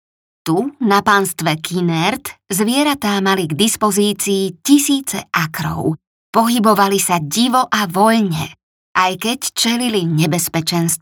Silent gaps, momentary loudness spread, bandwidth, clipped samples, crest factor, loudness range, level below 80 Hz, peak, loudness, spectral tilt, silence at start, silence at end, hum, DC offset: 6.07-6.33 s, 8.63-8.95 s; 7 LU; over 20 kHz; under 0.1%; 16 dB; 1 LU; -56 dBFS; 0 dBFS; -16 LUFS; -4 dB/octave; 0.45 s; 0.05 s; none; under 0.1%